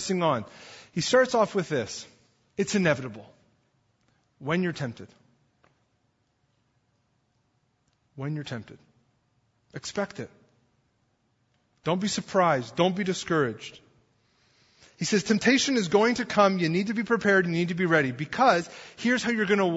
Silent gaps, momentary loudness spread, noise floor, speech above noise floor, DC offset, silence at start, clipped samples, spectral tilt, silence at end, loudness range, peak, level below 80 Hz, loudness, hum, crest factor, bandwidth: none; 17 LU; -72 dBFS; 46 dB; under 0.1%; 0 s; under 0.1%; -4.5 dB/octave; 0 s; 18 LU; -6 dBFS; -66 dBFS; -25 LUFS; none; 22 dB; 8 kHz